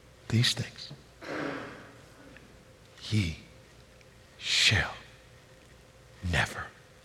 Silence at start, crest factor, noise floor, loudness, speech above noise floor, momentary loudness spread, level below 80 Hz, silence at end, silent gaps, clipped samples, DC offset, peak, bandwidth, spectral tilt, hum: 0.25 s; 24 dB; -55 dBFS; -29 LUFS; 27 dB; 24 LU; -54 dBFS; 0.3 s; none; under 0.1%; under 0.1%; -10 dBFS; 15 kHz; -3.5 dB/octave; none